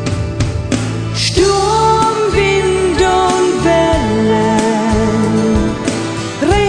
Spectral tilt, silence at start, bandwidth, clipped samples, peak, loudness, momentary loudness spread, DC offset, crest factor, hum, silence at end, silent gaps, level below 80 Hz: -5 dB/octave; 0 s; 10.5 kHz; under 0.1%; 0 dBFS; -13 LUFS; 6 LU; under 0.1%; 12 dB; none; 0 s; none; -26 dBFS